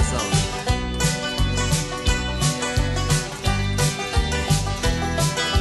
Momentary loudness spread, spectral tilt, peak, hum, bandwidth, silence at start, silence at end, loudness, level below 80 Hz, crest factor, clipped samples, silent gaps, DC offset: 2 LU; -4 dB/octave; -6 dBFS; none; 12.5 kHz; 0 s; 0 s; -22 LUFS; -28 dBFS; 14 dB; under 0.1%; none; under 0.1%